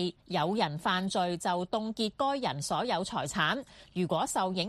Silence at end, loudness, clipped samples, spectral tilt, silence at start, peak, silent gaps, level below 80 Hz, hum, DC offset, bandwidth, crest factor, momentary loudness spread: 0 s; -31 LUFS; under 0.1%; -4 dB/octave; 0 s; -14 dBFS; none; -62 dBFS; none; under 0.1%; 13.5 kHz; 18 dB; 4 LU